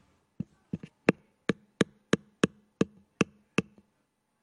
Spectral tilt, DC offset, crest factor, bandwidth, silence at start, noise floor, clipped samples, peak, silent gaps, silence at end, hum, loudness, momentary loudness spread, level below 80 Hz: -5.5 dB/octave; under 0.1%; 26 dB; 11.5 kHz; 0.75 s; -76 dBFS; under 0.1%; -6 dBFS; none; 0.8 s; none; -32 LUFS; 13 LU; -66 dBFS